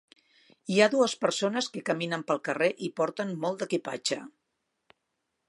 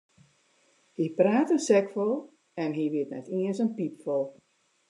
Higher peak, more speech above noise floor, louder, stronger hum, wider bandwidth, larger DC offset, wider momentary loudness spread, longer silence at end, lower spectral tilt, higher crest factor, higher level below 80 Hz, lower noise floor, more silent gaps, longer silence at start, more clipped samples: first, -6 dBFS vs -10 dBFS; first, 53 dB vs 40 dB; about the same, -28 LUFS vs -28 LUFS; neither; about the same, 11.5 kHz vs 11 kHz; neither; about the same, 9 LU vs 11 LU; first, 1.2 s vs 0.6 s; second, -4 dB/octave vs -6 dB/octave; about the same, 24 dB vs 20 dB; first, -82 dBFS vs -88 dBFS; first, -81 dBFS vs -66 dBFS; neither; second, 0.65 s vs 1 s; neither